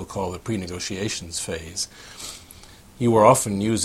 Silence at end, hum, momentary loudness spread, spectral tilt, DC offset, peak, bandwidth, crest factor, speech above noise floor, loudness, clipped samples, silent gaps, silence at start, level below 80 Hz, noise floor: 0 s; none; 20 LU; -4.5 dB/octave; under 0.1%; -2 dBFS; 16 kHz; 22 dB; 24 dB; -23 LUFS; under 0.1%; none; 0 s; -50 dBFS; -46 dBFS